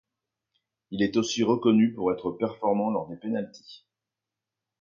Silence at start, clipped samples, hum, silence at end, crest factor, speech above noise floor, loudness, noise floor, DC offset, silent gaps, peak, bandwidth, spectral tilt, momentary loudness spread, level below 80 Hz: 0.9 s; under 0.1%; none; 1.05 s; 18 dB; 62 dB; -26 LUFS; -88 dBFS; under 0.1%; none; -10 dBFS; 7.2 kHz; -5.5 dB/octave; 10 LU; -66 dBFS